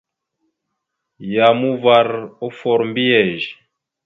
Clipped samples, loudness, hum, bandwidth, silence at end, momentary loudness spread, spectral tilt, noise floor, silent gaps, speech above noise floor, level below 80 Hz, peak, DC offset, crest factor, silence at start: under 0.1%; -16 LUFS; none; 7.2 kHz; 0.55 s; 13 LU; -7 dB/octave; -77 dBFS; none; 61 dB; -64 dBFS; 0 dBFS; under 0.1%; 18 dB; 1.2 s